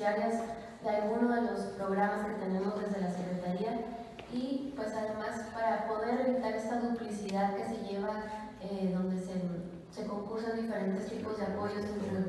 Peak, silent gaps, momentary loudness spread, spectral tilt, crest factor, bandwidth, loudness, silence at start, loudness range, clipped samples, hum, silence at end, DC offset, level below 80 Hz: -18 dBFS; none; 8 LU; -7 dB/octave; 16 dB; 12 kHz; -35 LUFS; 0 s; 3 LU; under 0.1%; none; 0 s; under 0.1%; -64 dBFS